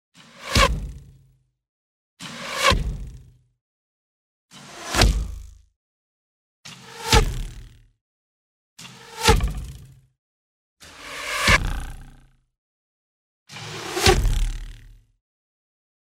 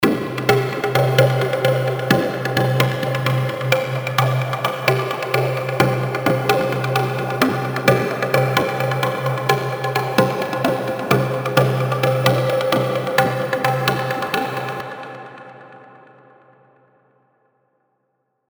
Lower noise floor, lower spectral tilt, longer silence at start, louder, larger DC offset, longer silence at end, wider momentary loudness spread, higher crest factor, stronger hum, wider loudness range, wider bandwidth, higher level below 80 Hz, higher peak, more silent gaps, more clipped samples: second, -60 dBFS vs -70 dBFS; second, -3.5 dB/octave vs -6 dB/octave; first, 0.35 s vs 0 s; about the same, -21 LUFS vs -19 LUFS; neither; second, 1.15 s vs 2.6 s; first, 23 LU vs 5 LU; about the same, 24 dB vs 20 dB; neither; about the same, 4 LU vs 6 LU; second, 16 kHz vs over 20 kHz; first, -30 dBFS vs -56 dBFS; about the same, -2 dBFS vs 0 dBFS; first, 1.69-2.17 s, 3.61-4.49 s, 5.76-6.63 s, 8.01-8.76 s, 10.19-10.77 s, 12.58-13.46 s vs none; neither